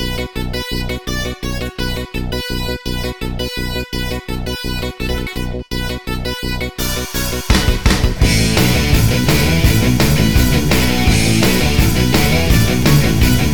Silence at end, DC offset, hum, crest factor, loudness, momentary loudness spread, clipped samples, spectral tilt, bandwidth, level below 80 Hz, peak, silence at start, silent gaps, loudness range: 0 s; under 0.1%; none; 14 dB; -16 LUFS; 10 LU; under 0.1%; -4.5 dB/octave; 19.5 kHz; -20 dBFS; 0 dBFS; 0 s; none; 9 LU